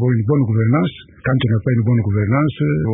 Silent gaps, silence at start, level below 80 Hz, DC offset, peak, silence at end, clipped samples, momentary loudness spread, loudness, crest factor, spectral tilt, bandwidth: none; 0 s; -40 dBFS; under 0.1%; -4 dBFS; 0 s; under 0.1%; 4 LU; -17 LUFS; 12 dB; -13.5 dB/octave; 3.8 kHz